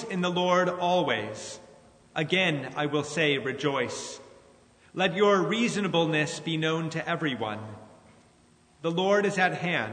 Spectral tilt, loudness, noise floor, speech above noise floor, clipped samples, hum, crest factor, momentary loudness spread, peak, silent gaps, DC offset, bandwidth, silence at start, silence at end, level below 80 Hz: -4.5 dB/octave; -27 LUFS; -60 dBFS; 33 dB; under 0.1%; none; 18 dB; 13 LU; -10 dBFS; none; under 0.1%; 9.6 kHz; 0 s; 0 s; -70 dBFS